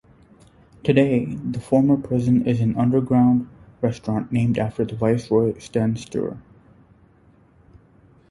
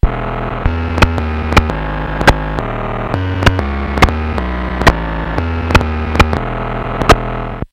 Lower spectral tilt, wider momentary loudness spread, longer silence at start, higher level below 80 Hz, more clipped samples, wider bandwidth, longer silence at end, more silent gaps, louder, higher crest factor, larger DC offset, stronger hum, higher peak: first, -8.5 dB/octave vs -6 dB/octave; about the same, 10 LU vs 8 LU; first, 0.85 s vs 0.05 s; second, -50 dBFS vs -20 dBFS; second, under 0.1% vs 0.8%; second, 11.5 kHz vs 17 kHz; first, 1.9 s vs 0.05 s; neither; second, -21 LUFS vs -15 LUFS; about the same, 18 dB vs 14 dB; neither; neither; about the same, -2 dBFS vs 0 dBFS